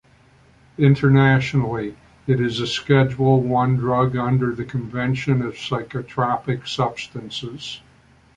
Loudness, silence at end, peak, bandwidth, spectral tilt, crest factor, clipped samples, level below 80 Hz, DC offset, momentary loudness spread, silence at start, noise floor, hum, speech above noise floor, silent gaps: -20 LUFS; 0.6 s; -2 dBFS; 8.6 kHz; -7 dB/octave; 18 dB; under 0.1%; -50 dBFS; under 0.1%; 15 LU; 0.8 s; -53 dBFS; none; 34 dB; none